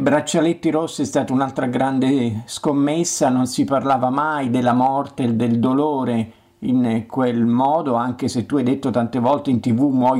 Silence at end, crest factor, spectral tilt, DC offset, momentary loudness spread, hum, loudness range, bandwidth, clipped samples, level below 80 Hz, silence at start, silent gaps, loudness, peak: 0 s; 12 dB; -6 dB/octave; under 0.1%; 4 LU; none; 1 LU; 14.5 kHz; under 0.1%; -58 dBFS; 0 s; none; -19 LUFS; -8 dBFS